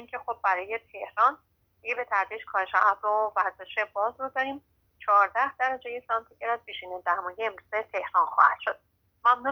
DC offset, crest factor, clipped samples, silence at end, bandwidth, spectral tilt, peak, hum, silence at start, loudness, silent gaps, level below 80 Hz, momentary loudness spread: under 0.1%; 22 dB; under 0.1%; 0 s; over 20 kHz; -3.5 dB/octave; -6 dBFS; none; 0 s; -27 LUFS; none; -70 dBFS; 13 LU